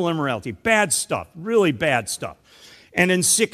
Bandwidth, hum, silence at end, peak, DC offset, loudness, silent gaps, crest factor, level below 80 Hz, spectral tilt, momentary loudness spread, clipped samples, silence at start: 15 kHz; none; 0.05 s; -2 dBFS; under 0.1%; -20 LUFS; none; 20 dB; -56 dBFS; -3 dB/octave; 11 LU; under 0.1%; 0 s